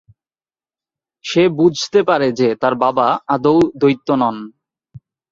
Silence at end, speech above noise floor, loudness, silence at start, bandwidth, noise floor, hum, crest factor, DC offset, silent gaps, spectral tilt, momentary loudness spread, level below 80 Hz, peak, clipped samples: 0.35 s; over 75 dB; -15 LUFS; 1.25 s; 7.6 kHz; under -90 dBFS; none; 16 dB; under 0.1%; none; -6 dB/octave; 7 LU; -56 dBFS; -2 dBFS; under 0.1%